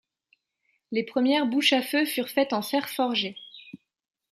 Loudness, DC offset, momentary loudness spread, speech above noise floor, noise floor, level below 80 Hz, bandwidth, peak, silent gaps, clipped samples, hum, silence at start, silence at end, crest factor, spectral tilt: -25 LUFS; under 0.1%; 13 LU; 49 dB; -74 dBFS; -78 dBFS; 14.5 kHz; -8 dBFS; none; under 0.1%; none; 0.9 s; 0.55 s; 18 dB; -3 dB/octave